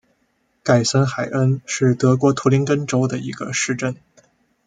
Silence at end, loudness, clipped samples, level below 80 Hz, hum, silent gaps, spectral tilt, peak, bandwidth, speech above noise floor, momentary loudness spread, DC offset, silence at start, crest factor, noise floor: 0.7 s; -19 LUFS; under 0.1%; -58 dBFS; none; none; -5.5 dB/octave; -2 dBFS; 9.4 kHz; 48 dB; 9 LU; under 0.1%; 0.65 s; 18 dB; -66 dBFS